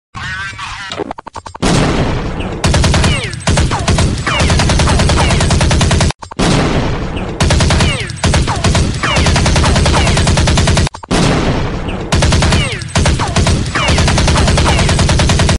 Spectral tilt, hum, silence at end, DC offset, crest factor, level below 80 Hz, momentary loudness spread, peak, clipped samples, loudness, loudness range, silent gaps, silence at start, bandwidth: -4.5 dB/octave; none; 0 s; under 0.1%; 10 dB; -18 dBFS; 10 LU; -2 dBFS; under 0.1%; -12 LUFS; 2 LU; 6.15-6.19 s; 0.15 s; 11.5 kHz